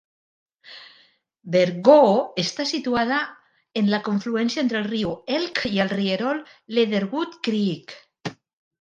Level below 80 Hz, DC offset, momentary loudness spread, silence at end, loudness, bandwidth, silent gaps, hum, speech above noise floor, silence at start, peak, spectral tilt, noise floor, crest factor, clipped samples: -62 dBFS; under 0.1%; 18 LU; 0.5 s; -22 LUFS; 9 kHz; none; none; 37 dB; 0.7 s; -2 dBFS; -5.5 dB/octave; -59 dBFS; 22 dB; under 0.1%